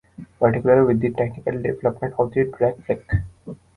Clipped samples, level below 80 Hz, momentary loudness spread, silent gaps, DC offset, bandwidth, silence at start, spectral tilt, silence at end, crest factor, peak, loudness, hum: under 0.1%; -40 dBFS; 10 LU; none; under 0.1%; 10 kHz; 0.2 s; -10.5 dB/octave; 0.25 s; 18 dB; -2 dBFS; -21 LUFS; none